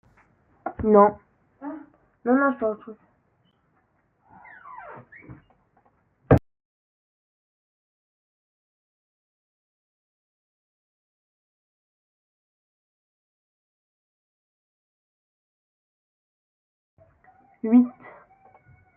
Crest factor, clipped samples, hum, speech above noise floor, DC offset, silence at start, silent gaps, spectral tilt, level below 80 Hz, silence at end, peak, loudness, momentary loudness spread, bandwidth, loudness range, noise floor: 26 dB; under 0.1%; none; 48 dB; under 0.1%; 0.65 s; 6.65-16.97 s; -11 dB/octave; -52 dBFS; 1.05 s; -2 dBFS; -21 LUFS; 28 LU; 3.3 kHz; 15 LU; -68 dBFS